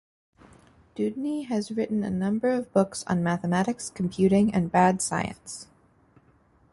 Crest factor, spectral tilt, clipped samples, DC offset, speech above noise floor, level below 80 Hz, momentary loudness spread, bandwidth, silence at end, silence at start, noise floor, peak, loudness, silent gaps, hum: 20 dB; -6 dB/octave; under 0.1%; under 0.1%; 36 dB; -58 dBFS; 10 LU; 11.5 kHz; 1.1 s; 0.95 s; -61 dBFS; -8 dBFS; -26 LUFS; none; none